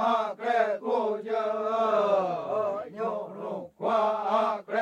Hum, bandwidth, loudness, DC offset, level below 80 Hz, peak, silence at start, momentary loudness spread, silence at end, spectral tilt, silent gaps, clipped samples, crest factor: none; 9.2 kHz; -28 LUFS; under 0.1%; -78 dBFS; -12 dBFS; 0 s; 8 LU; 0 s; -5.5 dB/octave; none; under 0.1%; 14 dB